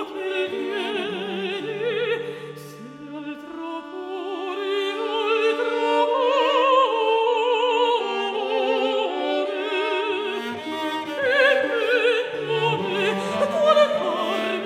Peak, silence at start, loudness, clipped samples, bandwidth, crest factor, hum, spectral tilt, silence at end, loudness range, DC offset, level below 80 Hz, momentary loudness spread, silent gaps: -4 dBFS; 0 s; -22 LUFS; under 0.1%; 14.5 kHz; 18 dB; none; -4.5 dB/octave; 0 s; 9 LU; under 0.1%; -74 dBFS; 14 LU; none